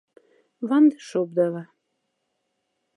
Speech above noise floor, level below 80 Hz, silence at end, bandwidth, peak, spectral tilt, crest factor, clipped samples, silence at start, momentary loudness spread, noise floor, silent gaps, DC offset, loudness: 55 dB; -86 dBFS; 1.35 s; 11 kHz; -8 dBFS; -7.5 dB/octave; 16 dB; under 0.1%; 0.6 s; 15 LU; -76 dBFS; none; under 0.1%; -22 LUFS